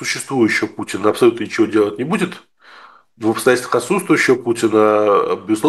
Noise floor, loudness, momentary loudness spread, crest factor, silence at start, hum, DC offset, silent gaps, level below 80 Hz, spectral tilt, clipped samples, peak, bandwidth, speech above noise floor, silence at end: -44 dBFS; -16 LUFS; 7 LU; 16 dB; 0 s; none; 0.1%; none; -66 dBFS; -4.5 dB/octave; under 0.1%; 0 dBFS; 12.5 kHz; 28 dB; 0 s